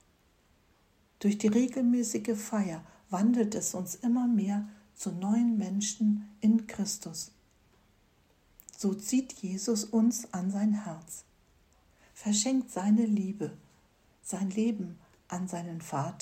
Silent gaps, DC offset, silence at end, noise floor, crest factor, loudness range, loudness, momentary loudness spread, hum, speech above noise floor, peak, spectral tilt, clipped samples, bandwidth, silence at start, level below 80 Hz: none; under 0.1%; 0 s; -67 dBFS; 16 dB; 4 LU; -31 LUFS; 13 LU; none; 37 dB; -16 dBFS; -5 dB/octave; under 0.1%; 16 kHz; 1.2 s; -70 dBFS